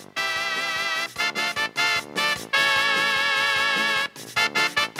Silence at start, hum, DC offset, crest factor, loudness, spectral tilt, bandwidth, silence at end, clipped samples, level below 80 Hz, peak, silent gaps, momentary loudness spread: 0 s; none; under 0.1%; 18 dB; -22 LUFS; -0.5 dB/octave; 16 kHz; 0 s; under 0.1%; -62 dBFS; -6 dBFS; none; 5 LU